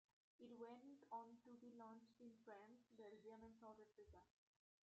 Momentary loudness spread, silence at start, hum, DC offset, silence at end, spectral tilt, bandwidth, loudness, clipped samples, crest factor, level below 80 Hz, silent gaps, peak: 9 LU; 0.4 s; none; under 0.1%; 0.7 s; -5 dB/octave; 7.6 kHz; -63 LUFS; under 0.1%; 20 dB; -88 dBFS; none; -44 dBFS